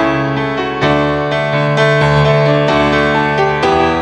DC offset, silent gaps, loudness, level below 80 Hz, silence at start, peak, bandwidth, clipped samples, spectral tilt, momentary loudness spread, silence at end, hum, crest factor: under 0.1%; none; -12 LUFS; -34 dBFS; 0 s; 0 dBFS; 9.4 kHz; under 0.1%; -6.5 dB/octave; 5 LU; 0 s; none; 12 dB